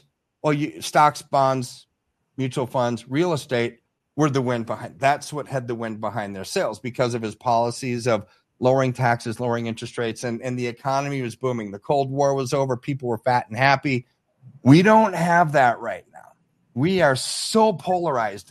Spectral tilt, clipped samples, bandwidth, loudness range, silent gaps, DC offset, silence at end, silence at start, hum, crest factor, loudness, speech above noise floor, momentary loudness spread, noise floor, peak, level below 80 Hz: -5.5 dB/octave; under 0.1%; 13 kHz; 6 LU; none; under 0.1%; 0.1 s; 0.45 s; none; 20 dB; -22 LUFS; 52 dB; 10 LU; -74 dBFS; -2 dBFS; -62 dBFS